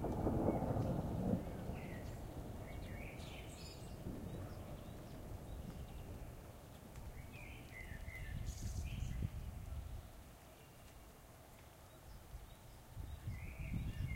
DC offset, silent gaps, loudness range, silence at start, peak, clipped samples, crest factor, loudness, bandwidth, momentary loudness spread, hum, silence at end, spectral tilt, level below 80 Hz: under 0.1%; none; 11 LU; 0 s; -24 dBFS; under 0.1%; 22 dB; -47 LUFS; 16 kHz; 19 LU; none; 0 s; -7 dB/octave; -52 dBFS